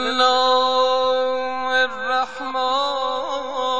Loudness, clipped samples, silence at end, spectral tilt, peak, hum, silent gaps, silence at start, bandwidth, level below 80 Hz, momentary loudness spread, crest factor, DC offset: -20 LUFS; under 0.1%; 0 s; -1.5 dB/octave; -6 dBFS; none; none; 0 s; 8.6 kHz; -56 dBFS; 8 LU; 14 dB; 1%